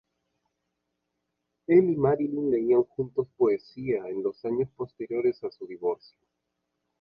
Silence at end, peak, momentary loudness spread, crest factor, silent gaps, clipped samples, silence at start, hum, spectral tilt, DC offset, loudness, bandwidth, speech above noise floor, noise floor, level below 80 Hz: 1.05 s; -10 dBFS; 13 LU; 20 dB; none; under 0.1%; 1.7 s; none; -11 dB/octave; under 0.1%; -27 LUFS; 5.4 kHz; 55 dB; -81 dBFS; -64 dBFS